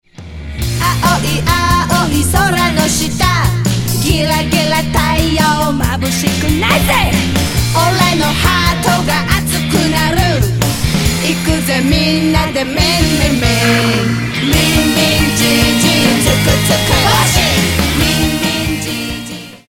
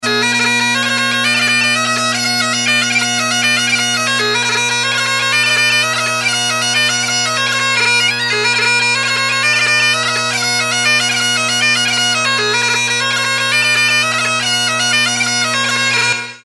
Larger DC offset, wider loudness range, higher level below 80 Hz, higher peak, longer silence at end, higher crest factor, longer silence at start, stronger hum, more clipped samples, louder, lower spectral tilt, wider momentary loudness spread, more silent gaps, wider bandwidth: neither; about the same, 2 LU vs 1 LU; first, -24 dBFS vs -60 dBFS; about the same, 0 dBFS vs -2 dBFS; about the same, 0.15 s vs 0.05 s; about the same, 12 dB vs 12 dB; first, 0.2 s vs 0 s; neither; neither; about the same, -12 LUFS vs -12 LUFS; first, -4 dB/octave vs -1 dB/octave; about the same, 5 LU vs 3 LU; neither; first, 17.5 kHz vs 12 kHz